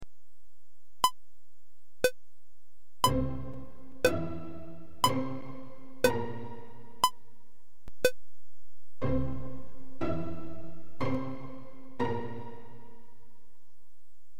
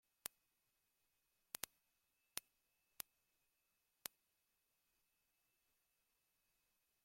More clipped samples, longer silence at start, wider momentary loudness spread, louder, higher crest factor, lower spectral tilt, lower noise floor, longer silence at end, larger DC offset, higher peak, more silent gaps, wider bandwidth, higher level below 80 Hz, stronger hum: neither; second, 0 s vs 2.35 s; first, 20 LU vs 5 LU; first, -33 LUFS vs -54 LUFS; second, 22 dB vs 46 dB; first, -4.5 dB/octave vs 0.5 dB/octave; second, -73 dBFS vs -86 dBFS; second, 0 s vs 4.65 s; first, 2% vs under 0.1%; first, -12 dBFS vs -16 dBFS; neither; about the same, 16.5 kHz vs 16.5 kHz; first, -50 dBFS vs under -90 dBFS; neither